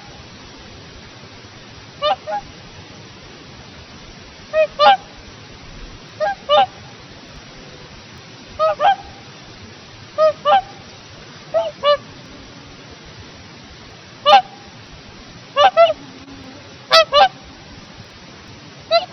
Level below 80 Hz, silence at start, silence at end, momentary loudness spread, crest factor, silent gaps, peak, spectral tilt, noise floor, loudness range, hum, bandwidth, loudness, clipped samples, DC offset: -50 dBFS; 0.1 s; 0.05 s; 25 LU; 20 dB; none; 0 dBFS; 0 dB/octave; -39 dBFS; 10 LU; none; 6.6 kHz; -16 LUFS; under 0.1%; under 0.1%